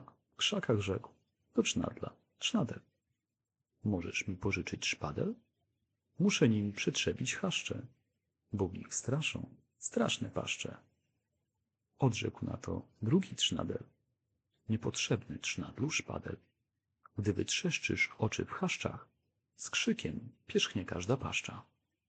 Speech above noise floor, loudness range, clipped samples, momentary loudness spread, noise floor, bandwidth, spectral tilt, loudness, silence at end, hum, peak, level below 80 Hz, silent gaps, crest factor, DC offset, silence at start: 54 dB; 4 LU; under 0.1%; 12 LU; -89 dBFS; 9.2 kHz; -4 dB/octave; -35 LUFS; 0.45 s; none; -16 dBFS; -68 dBFS; none; 22 dB; under 0.1%; 0 s